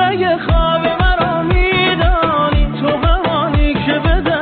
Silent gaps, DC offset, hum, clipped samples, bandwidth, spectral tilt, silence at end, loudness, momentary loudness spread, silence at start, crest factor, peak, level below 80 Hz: none; under 0.1%; none; under 0.1%; 4.6 kHz; -4 dB/octave; 0 s; -14 LUFS; 3 LU; 0 s; 10 dB; -2 dBFS; -18 dBFS